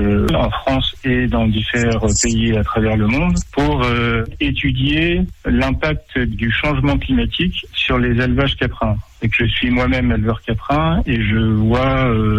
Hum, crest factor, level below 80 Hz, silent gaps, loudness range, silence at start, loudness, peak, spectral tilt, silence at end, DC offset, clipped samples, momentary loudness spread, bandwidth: none; 10 dB; -26 dBFS; none; 1 LU; 0 s; -17 LUFS; -6 dBFS; -5.5 dB/octave; 0 s; under 0.1%; under 0.1%; 4 LU; 11 kHz